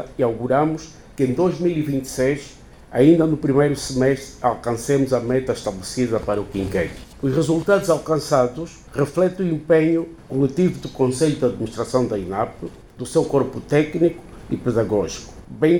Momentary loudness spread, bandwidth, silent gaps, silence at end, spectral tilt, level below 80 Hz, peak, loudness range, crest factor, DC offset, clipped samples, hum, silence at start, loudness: 10 LU; 18.5 kHz; none; 0 s; -6.5 dB/octave; -44 dBFS; -4 dBFS; 3 LU; 16 dB; under 0.1%; under 0.1%; none; 0 s; -21 LUFS